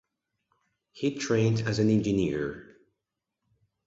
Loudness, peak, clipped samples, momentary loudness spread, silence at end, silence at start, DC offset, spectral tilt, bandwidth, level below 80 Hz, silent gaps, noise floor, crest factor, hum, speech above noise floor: -27 LUFS; -12 dBFS; under 0.1%; 9 LU; 1.25 s; 0.95 s; under 0.1%; -6.5 dB/octave; 7.8 kHz; -56 dBFS; none; -85 dBFS; 18 dB; none; 59 dB